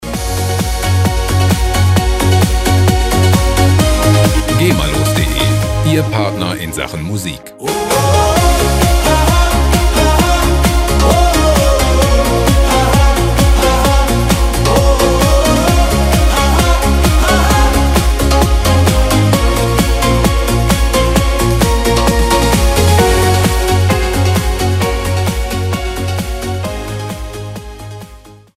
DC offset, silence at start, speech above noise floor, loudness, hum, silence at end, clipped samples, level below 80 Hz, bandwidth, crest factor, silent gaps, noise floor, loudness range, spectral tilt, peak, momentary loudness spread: under 0.1%; 0 s; 19 dB; -12 LUFS; none; 0.4 s; under 0.1%; -16 dBFS; 16 kHz; 10 dB; none; -37 dBFS; 4 LU; -5 dB/octave; 0 dBFS; 9 LU